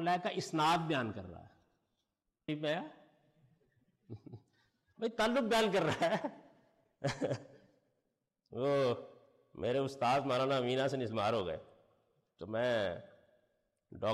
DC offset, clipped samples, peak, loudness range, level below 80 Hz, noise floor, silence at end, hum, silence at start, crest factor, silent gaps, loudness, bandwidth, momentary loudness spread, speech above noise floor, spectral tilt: under 0.1%; under 0.1%; -24 dBFS; 9 LU; -70 dBFS; -86 dBFS; 0 s; none; 0 s; 14 dB; none; -35 LUFS; 13.5 kHz; 19 LU; 52 dB; -5.5 dB/octave